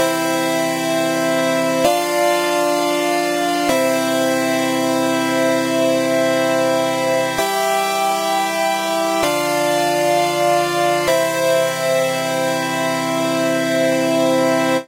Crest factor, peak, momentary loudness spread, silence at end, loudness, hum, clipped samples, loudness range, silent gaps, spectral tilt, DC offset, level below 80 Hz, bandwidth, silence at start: 14 dB; -2 dBFS; 2 LU; 0 s; -17 LUFS; none; under 0.1%; 1 LU; none; -3.5 dB/octave; under 0.1%; -58 dBFS; 16 kHz; 0 s